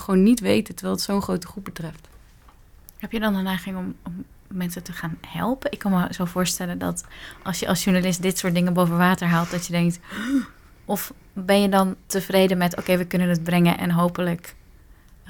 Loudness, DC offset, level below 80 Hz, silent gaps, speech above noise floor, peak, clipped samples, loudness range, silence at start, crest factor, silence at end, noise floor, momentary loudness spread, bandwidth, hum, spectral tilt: -23 LUFS; under 0.1%; -48 dBFS; none; 28 dB; -6 dBFS; under 0.1%; 8 LU; 0 s; 18 dB; 0 s; -50 dBFS; 15 LU; 19 kHz; none; -5.5 dB/octave